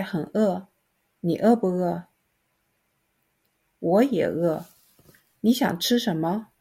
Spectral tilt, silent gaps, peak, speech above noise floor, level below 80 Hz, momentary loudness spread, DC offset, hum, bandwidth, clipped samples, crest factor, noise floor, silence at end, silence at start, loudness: -6 dB/octave; none; -8 dBFS; 49 dB; -68 dBFS; 11 LU; under 0.1%; none; 16.5 kHz; under 0.1%; 18 dB; -72 dBFS; 0.15 s; 0 s; -24 LUFS